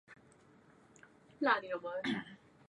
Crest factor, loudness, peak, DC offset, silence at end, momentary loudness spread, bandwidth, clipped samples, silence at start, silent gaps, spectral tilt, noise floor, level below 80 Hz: 24 dB; -36 LUFS; -16 dBFS; under 0.1%; 0.35 s; 9 LU; 10.5 kHz; under 0.1%; 0.1 s; none; -5 dB/octave; -64 dBFS; -78 dBFS